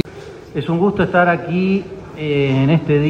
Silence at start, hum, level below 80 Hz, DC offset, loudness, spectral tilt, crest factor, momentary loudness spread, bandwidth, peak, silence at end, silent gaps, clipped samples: 0.05 s; none; -46 dBFS; under 0.1%; -17 LUFS; -8.5 dB/octave; 14 dB; 13 LU; 7.8 kHz; -2 dBFS; 0 s; none; under 0.1%